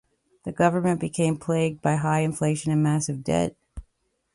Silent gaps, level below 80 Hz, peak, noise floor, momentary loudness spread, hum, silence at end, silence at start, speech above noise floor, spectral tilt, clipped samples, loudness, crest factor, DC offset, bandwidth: none; -52 dBFS; -6 dBFS; -71 dBFS; 4 LU; none; 0.5 s; 0.45 s; 48 dB; -6.5 dB/octave; under 0.1%; -24 LUFS; 18 dB; under 0.1%; 11.5 kHz